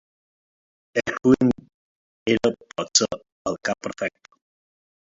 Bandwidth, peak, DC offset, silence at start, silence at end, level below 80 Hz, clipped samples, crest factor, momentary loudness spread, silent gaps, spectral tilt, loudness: 7.8 kHz; -2 dBFS; under 0.1%; 0.95 s; 1.05 s; -56 dBFS; under 0.1%; 24 dB; 12 LU; 1.74-2.26 s, 3.32-3.45 s; -3.5 dB/octave; -23 LUFS